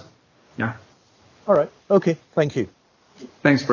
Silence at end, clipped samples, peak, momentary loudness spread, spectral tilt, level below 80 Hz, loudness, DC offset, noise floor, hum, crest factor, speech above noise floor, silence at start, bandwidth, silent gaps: 0 s; under 0.1%; -2 dBFS; 15 LU; -7 dB/octave; -60 dBFS; -22 LUFS; under 0.1%; -55 dBFS; none; 22 dB; 35 dB; 0.6 s; 7.2 kHz; none